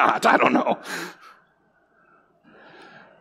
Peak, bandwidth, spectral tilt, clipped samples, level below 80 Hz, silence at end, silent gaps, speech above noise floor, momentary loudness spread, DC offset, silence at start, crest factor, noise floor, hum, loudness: -2 dBFS; 16 kHz; -4 dB/octave; under 0.1%; -78 dBFS; 2.1 s; none; 43 dB; 15 LU; under 0.1%; 0 s; 22 dB; -63 dBFS; none; -20 LUFS